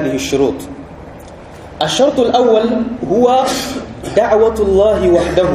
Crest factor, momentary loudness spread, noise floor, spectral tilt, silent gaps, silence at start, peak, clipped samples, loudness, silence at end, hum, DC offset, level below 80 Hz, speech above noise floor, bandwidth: 14 dB; 22 LU; -33 dBFS; -5 dB/octave; none; 0 s; 0 dBFS; under 0.1%; -13 LUFS; 0 s; none; under 0.1%; -34 dBFS; 21 dB; 15 kHz